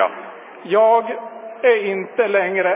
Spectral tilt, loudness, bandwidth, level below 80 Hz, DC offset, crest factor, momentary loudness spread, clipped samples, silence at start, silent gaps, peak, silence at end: -8 dB/octave; -18 LUFS; 3.9 kHz; under -90 dBFS; under 0.1%; 16 dB; 19 LU; under 0.1%; 0 s; none; -2 dBFS; 0 s